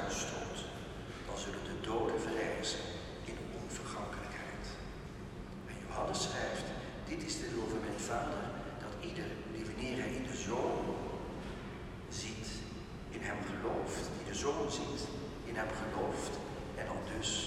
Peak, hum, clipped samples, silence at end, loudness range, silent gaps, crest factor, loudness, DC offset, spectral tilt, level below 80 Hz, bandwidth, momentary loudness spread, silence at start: -24 dBFS; none; under 0.1%; 0 s; 3 LU; none; 16 dB; -40 LUFS; under 0.1%; -4 dB/octave; -52 dBFS; 15.5 kHz; 10 LU; 0 s